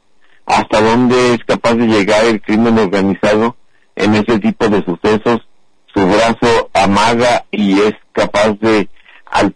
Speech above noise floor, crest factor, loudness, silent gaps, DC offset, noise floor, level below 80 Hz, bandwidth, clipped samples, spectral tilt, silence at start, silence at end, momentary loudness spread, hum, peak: 21 dB; 12 dB; -12 LUFS; none; under 0.1%; -33 dBFS; -40 dBFS; 10.5 kHz; under 0.1%; -5.5 dB/octave; 0.45 s; 0.05 s; 6 LU; none; -2 dBFS